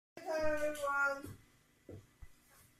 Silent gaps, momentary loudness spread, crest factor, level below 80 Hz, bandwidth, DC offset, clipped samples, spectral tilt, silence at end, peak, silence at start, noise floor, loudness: none; 22 LU; 16 dB; -62 dBFS; 15 kHz; under 0.1%; under 0.1%; -4 dB/octave; 0.45 s; -24 dBFS; 0.15 s; -68 dBFS; -37 LUFS